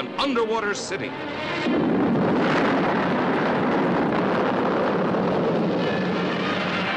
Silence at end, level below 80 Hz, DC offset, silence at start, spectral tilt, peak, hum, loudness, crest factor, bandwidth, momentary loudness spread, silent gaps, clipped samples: 0 s; -54 dBFS; under 0.1%; 0 s; -6 dB/octave; -12 dBFS; none; -23 LUFS; 10 dB; 10 kHz; 5 LU; none; under 0.1%